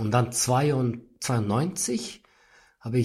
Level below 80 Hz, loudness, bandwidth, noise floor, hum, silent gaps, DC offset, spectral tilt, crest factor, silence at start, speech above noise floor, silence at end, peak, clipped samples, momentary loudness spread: -58 dBFS; -26 LUFS; 14.5 kHz; -59 dBFS; none; none; under 0.1%; -5 dB/octave; 18 dB; 0 s; 34 dB; 0 s; -8 dBFS; under 0.1%; 10 LU